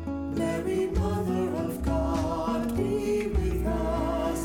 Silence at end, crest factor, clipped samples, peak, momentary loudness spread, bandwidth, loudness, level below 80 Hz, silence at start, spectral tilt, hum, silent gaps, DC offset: 0 s; 12 dB; under 0.1%; -16 dBFS; 2 LU; 17.5 kHz; -28 LUFS; -34 dBFS; 0 s; -7 dB/octave; none; none; under 0.1%